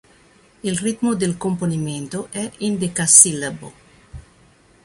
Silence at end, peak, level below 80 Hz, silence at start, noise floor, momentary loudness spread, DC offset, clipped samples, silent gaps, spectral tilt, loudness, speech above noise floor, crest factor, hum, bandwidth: 0.65 s; 0 dBFS; -52 dBFS; 0.65 s; -53 dBFS; 18 LU; under 0.1%; under 0.1%; none; -3.5 dB/octave; -17 LUFS; 33 dB; 22 dB; none; 16 kHz